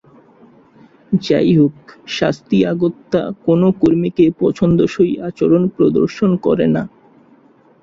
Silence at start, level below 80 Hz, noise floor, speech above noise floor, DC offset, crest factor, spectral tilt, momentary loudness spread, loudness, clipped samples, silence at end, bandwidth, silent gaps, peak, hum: 1.1 s; -48 dBFS; -49 dBFS; 35 dB; under 0.1%; 14 dB; -8 dB/octave; 7 LU; -15 LUFS; under 0.1%; 0.95 s; 7.6 kHz; none; -2 dBFS; none